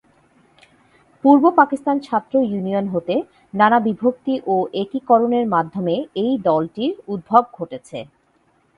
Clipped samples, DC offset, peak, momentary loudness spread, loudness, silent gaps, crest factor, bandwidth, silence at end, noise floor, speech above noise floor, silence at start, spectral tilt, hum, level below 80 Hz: under 0.1%; under 0.1%; 0 dBFS; 14 LU; -18 LUFS; none; 20 dB; 11 kHz; 0.75 s; -61 dBFS; 43 dB; 1.25 s; -8 dB/octave; none; -62 dBFS